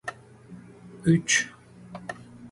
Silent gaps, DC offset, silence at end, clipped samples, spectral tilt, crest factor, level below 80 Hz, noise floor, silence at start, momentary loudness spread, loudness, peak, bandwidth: none; under 0.1%; 0.05 s; under 0.1%; -4 dB/octave; 20 dB; -60 dBFS; -47 dBFS; 0.05 s; 26 LU; -24 LUFS; -8 dBFS; 11.5 kHz